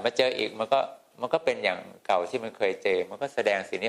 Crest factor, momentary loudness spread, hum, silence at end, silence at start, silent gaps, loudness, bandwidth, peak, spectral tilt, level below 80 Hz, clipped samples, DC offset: 20 dB; 7 LU; none; 0 s; 0 s; none; -28 LUFS; 12.5 kHz; -8 dBFS; -3.5 dB/octave; -72 dBFS; under 0.1%; under 0.1%